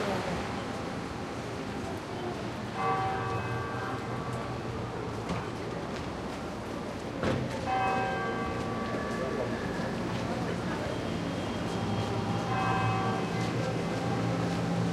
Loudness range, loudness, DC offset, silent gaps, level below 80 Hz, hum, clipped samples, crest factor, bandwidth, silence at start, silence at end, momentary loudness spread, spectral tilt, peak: 4 LU; -33 LUFS; under 0.1%; none; -50 dBFS; none; under 0.1%; 16 dB; 13.5 kHz; 0 s; 0 s; 7 LU; -6 dB/octave; -16 dBFS